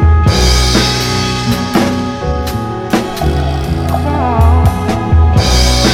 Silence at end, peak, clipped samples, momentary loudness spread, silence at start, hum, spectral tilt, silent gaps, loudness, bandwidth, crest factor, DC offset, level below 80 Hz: 0 s; 0 dBFS; under 0.1%; 7 LU; 0 s; none; -5 dB/octave; none; -12 LUFS; 16 kHz; 10 dB; 0.3%; -16 dBFS